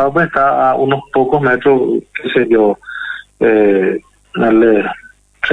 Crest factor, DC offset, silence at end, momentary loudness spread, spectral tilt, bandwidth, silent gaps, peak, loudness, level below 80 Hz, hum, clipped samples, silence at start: 12 dB; under 0.1%; 0 s; 13 LU; -8 dB/octave; 9.2 kHz; none; -2 dBFS; -13 LUFS; -46 dBFS; 50 Hz at -50 dBFS; under 0.1%; 0 s